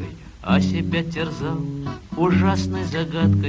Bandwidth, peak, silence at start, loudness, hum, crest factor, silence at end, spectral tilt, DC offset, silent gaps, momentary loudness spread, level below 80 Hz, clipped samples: 8 kHz; -6 dBFS; 0 s; -22 LUFS; none; 16 dB; 0 s; -7 dB/octave; under 0.1%; none; 12 LU; -36 dBFS; under 0.1%